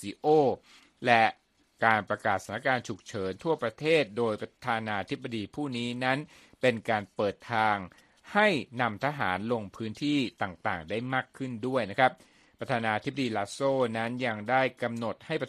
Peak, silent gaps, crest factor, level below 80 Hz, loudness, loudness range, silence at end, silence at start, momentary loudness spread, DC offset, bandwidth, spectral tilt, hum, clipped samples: -6 dBFS; none; 24 dB; -68 dBFS; -29 LUFS; 3 LU; 0 s; 0 s; 10 LU; under 0.1%; 13 kHz; -5.5 dB/octave; none; under 0.1%